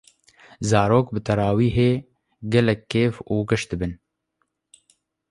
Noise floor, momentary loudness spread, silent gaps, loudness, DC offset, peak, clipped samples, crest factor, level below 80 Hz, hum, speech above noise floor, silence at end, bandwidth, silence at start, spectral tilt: -74 dBFS; 10 LU; none; -22 LUFS; under 0.1%; -4 dBFS; under 0.1%; 20 dB; -44 dBFS; none; 54 dB; 1.35 s; 11.5 kHz; 0.6 s; -6.5 dB/octave